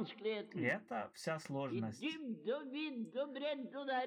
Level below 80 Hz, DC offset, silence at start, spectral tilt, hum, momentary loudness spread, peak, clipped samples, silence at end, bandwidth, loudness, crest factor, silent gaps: -90 dBFS; under 0.1%; 0 s; -5.5 dB/octave; none; 5 LU; -24 dBFS; under 0.1%; 0 s; 15 kHz; -42 LUFS; 18 dB; none